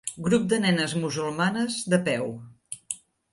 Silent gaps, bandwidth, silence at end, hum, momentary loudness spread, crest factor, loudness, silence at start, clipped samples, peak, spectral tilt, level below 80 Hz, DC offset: none; 11.5 kHz; 0.35 s; none; 14 LU; 20 dB; -26 LUFS; 0.05 s; under 0.1%; -8 dBFS; -4.5 dB/octave; -62 dBFS; under 0.1%